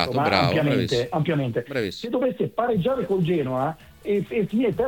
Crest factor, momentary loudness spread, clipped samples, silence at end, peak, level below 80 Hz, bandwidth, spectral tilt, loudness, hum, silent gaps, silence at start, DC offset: 20 dB; 7 LU; under 0.1%; 0 s; -4 dBFS; -52 dBFS; 18.5 kHz; -7 dB/octave; -24 LUFS; none; none; 0 s; under 0.1%